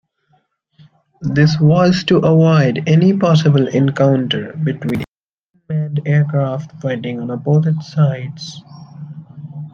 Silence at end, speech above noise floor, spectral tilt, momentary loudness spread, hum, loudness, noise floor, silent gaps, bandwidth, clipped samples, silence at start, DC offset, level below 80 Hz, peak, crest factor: 0.05 s; 53 dB; -7.5 dB/octave; 20 LU; none; -15 LUFS; -67 dBFS; 5.08-5.54 s; 7 kHz; under 0.1%; 1.2 s; under 0.1%; -52 dBFS; -2 dBFS; 14 dB